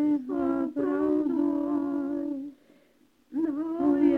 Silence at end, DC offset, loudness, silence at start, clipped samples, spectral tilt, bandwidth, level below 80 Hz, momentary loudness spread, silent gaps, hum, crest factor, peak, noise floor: 0 s; under 0.1%; -28 LUFS; 0 s; under 0.1%; -8.5 dB/octave; 3.3 kHz; -62 dBFS; 8 LU; none; none; 16 dB; -12 dBFS; -64 dBFS